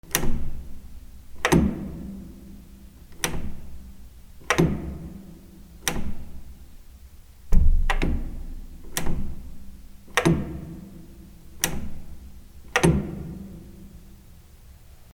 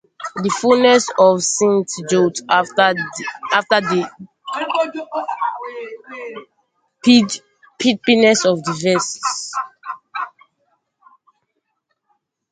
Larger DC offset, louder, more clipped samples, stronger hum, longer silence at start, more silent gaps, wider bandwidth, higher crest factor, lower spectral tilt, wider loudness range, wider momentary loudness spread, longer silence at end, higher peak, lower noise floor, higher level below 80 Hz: neither; second, -27 LUFS vs -17 LUFS; neither; neither; second, 0.05 s vs 0.2 s; neither; first, 17 kHz vs 9.6 kHz; first, 24 dB vs 18 dB; about the same, -4.5 dB/octave vs -3.5 dB/octave; second, 2 LU vs 9 LU; first, 26 LU vs 18 LU; second, 1 s vs 2.2 s; about the same, -2 dBFS vs 0 dBFS; second, -48 dBFS vs -72 dBFS; first, -30 dBFS vs -64 dBFS